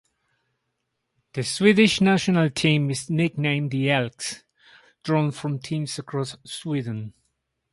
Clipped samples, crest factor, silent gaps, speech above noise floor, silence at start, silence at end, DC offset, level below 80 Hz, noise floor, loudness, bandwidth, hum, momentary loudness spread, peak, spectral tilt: under 0.1%; 20 dB; none; 55 dB; 1.35 s; 0.6 s; under 0.1%; -60 dBFS; -78 dBFS; -23 LUFS; 11.5 kHz; none; 15 LU; -4 dBFS; -5.5 dB/octave